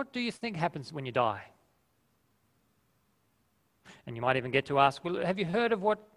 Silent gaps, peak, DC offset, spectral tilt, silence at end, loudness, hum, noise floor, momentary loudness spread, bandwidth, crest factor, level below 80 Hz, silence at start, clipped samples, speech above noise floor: none; -10 dBFS; under 0.1%; -6 dB/octave; 0.15 s; -30 LUFS; none; -73 dBFS; 11 LU; 14.5 kHz; 24 dB; -66 dBFS; 0 s; under 0.1%; 42 dB